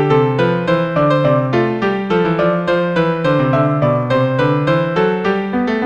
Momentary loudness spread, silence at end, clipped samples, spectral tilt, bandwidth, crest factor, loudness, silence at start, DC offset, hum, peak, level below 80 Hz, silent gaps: 3 LU; 0 s; under 0.1%; -8.5 dB/octave; 8.2 kHz; 14 dB; -15 LUFS; 0 s; 0.2%; none; -2 dBFS; -46 dBFS; none